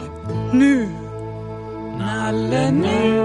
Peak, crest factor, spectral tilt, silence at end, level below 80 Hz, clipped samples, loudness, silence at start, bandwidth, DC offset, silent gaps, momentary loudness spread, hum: -6 dBFS; 14 dB; -7 dB/octave; 0 s; -44 dBFS; under 0.1%; -19 LUFS; 0 s; 11 kHz; under 0.1%; none; 15 LU; none